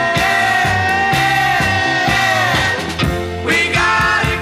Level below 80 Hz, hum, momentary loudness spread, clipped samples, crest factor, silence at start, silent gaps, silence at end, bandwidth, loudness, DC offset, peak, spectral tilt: -34 dBFS; none; 5 LU; under 0.1%; 12 dB; 0 s; none; 0 s; 15.5 kHz; -14 LUFS; 0.1%; -2 dBFS; -4 dB/octave